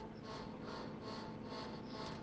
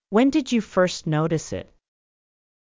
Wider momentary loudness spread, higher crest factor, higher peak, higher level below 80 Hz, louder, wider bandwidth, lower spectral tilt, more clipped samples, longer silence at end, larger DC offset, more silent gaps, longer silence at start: second, 1 LU vs 11 LU; second, 12 dB vs 18 dB; second, -34 dBFS vs -6 dBFS; second, -66 dBFS vs -54 dBFS; second, -48 LUFS vs -22 LUFS; first, 9.4 kHz vs 7.6 kHz; about the same, -6 dB/octave vs -6 dB/octave; neither; second, 0 s vs 1 s; neither; neither; about the same, 0 s vs 0.1 s